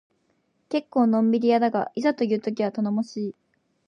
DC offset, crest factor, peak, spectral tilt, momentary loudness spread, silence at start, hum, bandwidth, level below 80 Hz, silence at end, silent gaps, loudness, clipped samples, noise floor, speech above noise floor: under 0.1%; 16 dB; -10 dBFS; -7 dB/octave; 9 LU; 0.7 s; none; 7 kHz; -76 dBFS; 0.55 s; none; -24 LUFS; under 0.1%; -69 dBFS; 46 dB